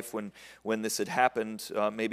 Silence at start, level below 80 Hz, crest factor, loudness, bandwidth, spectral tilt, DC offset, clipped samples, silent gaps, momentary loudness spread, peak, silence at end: 0 s; -74 dBFS; 22 dB; -31 LUFS; 16 kHz; -3.5 dB/octave; under 0.1%; under 0.1%; none; 13 LU; -8 dBFS; 0 s